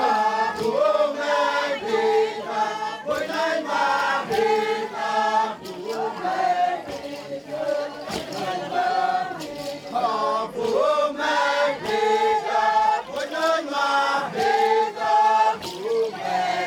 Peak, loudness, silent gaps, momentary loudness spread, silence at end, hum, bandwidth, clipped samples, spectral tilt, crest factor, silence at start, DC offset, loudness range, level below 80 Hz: -8 dBFS; -23 LUFS; none; 9 LU; 0 s; none; 17.5 kHz; under 0.1%; -3 dB/octave; 14 dB; 0 s; under 0.1%; 5 LU; -64 dBFS